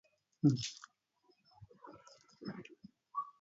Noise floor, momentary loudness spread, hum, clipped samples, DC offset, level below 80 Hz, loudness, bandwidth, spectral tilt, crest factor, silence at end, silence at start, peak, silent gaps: -75 dBFS; 25 LU; none; under 0.1%; under 0.1%; -76 dBFS; -38 LUFS; 7.6 kHz; -6.5 dB/octave; 24 dB; 0.1 s; 0.45 s; -18 dBFS; none